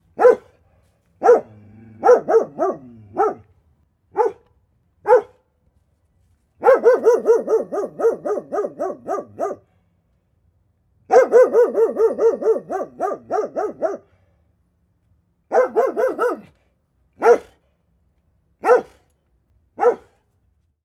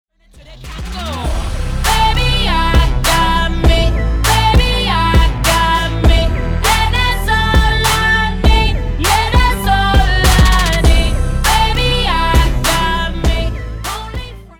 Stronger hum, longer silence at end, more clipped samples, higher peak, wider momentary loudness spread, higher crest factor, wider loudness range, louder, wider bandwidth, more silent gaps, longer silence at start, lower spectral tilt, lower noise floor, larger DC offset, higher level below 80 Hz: neither; first, 0.85 s vs 0.15 s; neither; about the same, -2 dBFS vs -2 dBFS; first, 14 LU vs 10 LU; first, 18 dB vs 12 dB; first, 6 LU vs 3 LU; second, -18 LUFS vs -13 LUFS; second, 10.5 kHz vs 19.5 kHz; neither; second, 0.2 s vs 0.35 s; first, -5.5 dB/octave vs -4 dB/octave; first, -64 dBFS vs -40 dBFS; neither; second, -64 dBFS vs -16 dBFS